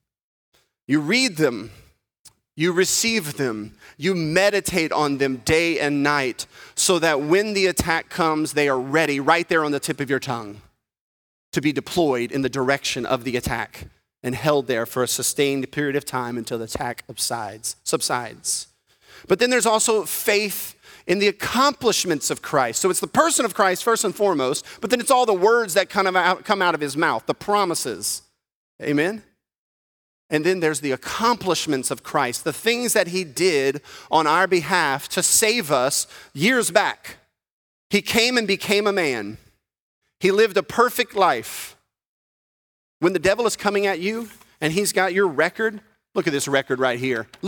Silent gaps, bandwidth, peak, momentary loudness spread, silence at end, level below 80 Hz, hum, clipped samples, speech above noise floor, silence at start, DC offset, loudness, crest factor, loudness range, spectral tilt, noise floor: 2.19-2.24 s, 11.01-11.52 s, 28.54-28.79 s, 29.58-30.29 s, 37.51-37.90 s, 39.80-40.01 s, 42.06-43.00 s; 19.5 kHz; 0 dBFS; 10 LU; 0 s; -54 dBFS; none; under 0.1%; 33 dB; 0.9 s; under 0.1%; -21 LUFS; 22 dB; 5 LU; -3 dB/octave; -55 dBFS